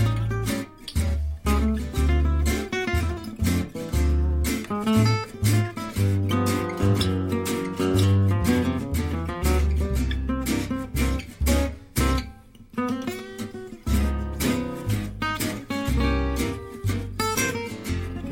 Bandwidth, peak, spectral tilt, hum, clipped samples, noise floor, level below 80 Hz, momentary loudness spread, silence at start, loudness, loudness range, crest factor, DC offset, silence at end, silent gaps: 17 kHz; -8 dBFS; -5.5 dB/octave; none; under 0.1%; -44 dBFS; -30 dBFS; 8 LU; 0 s; -25 LUFS; 4 LU; 16 dB; under 0.1%; 0 s; none